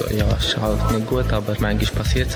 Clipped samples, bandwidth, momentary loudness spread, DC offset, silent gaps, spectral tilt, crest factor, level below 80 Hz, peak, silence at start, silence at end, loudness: under 0.1%; over 20 kHz; 2 LU; under 0.1%; none; -5.5 dB/octave; 14 dB; -26 dBFS; -6 dBFS; 0 s; 0 s; -21 LUFS